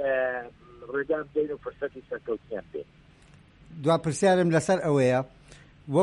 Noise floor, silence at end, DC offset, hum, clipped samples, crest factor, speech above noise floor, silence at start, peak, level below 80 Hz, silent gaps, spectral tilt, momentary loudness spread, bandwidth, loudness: -55 dBFS; 0 s; under 0.1%; none; under 0.1%; 16 dB; 28 dB; 0 s; -10 dBFS; -60 dBFS; none; -6 dB/octave; 18 LU; 11.5 kHz; -27 LUFS